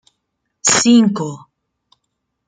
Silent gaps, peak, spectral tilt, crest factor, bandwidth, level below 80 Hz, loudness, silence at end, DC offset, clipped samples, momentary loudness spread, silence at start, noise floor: none; 0 dBFS; -3 dB/octave; 18 dB; 9.6 kHz; -60 dBFS; -13 LUFS; 1.1 s; under 0.1%; under 0.1%; 14 LU; 0.65 s; -74 dBFS